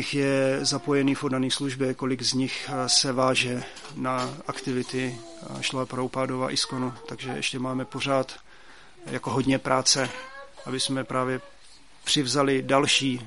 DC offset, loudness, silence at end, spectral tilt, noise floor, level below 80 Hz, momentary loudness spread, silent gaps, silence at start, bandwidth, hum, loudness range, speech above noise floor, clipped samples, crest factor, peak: 0.3%; -26 LUFS; 0 s; -3.5 dB/octave; -54 dBFS; -60 dBFS; 13 LU; none; 0 s; 11.5 kHz; none; 5 LU; 28 dB; under 0.1%; 22 dB; -6 dBFS